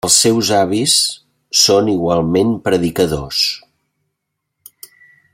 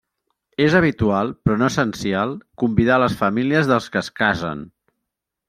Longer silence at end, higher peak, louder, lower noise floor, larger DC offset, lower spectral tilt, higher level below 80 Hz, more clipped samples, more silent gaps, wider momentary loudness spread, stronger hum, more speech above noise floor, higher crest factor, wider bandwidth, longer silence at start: first, 1.75 s vs 0.8 s; about the same, 0 dBFS vs -2 dBFS; first, -14 LUFS vs -19 LUFS; second, -75 dBFS vs -81 dBFS; neither; second, -3 dB/octave vs -6.5 dB/octave; about the same, -46 dBFS vs -46 dBFS; neither; neither; about the same, 7 LU vs 9 LU; neither; about the same, 61 dB vs 62 dB; about the same, 16 dB vs 18 dB; first, 16.5 kHz vs 14.5 kHz; second, 0.05 s vs 0.6 s